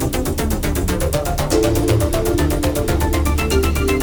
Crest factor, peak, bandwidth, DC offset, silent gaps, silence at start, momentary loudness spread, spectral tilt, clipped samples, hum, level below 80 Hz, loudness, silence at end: 14 dB; -4 dBFS; over 20 kHz; under 0.1%; none; 0 s; 4 LU; -5.5 dB/octave; under 0.1%; none; -22 dBFS; -18 LUFS; 0 s